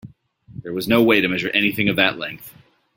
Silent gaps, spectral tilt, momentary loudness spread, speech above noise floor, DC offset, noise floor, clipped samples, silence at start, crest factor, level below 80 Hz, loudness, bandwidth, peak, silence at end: none; -5.5 dB/octave; 15 LU; 29 dB; under 0.1%; -48 dBFS; under 0.1%; 0.05 s; 20 dB; -54 dBFS; -18 LUFS; 17 kHz; -2 dBFS; 0.45 s